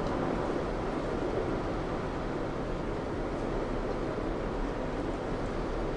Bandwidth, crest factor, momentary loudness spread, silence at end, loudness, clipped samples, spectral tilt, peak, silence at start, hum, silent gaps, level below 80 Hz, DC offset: 10.5 kHz; 16 dB; 3 LU; 0 s; -34 LUFS; under 0.1%; -7 dB/octave; -18 dBFS; 0 s; none; none; -40 dBFS; under 0.1%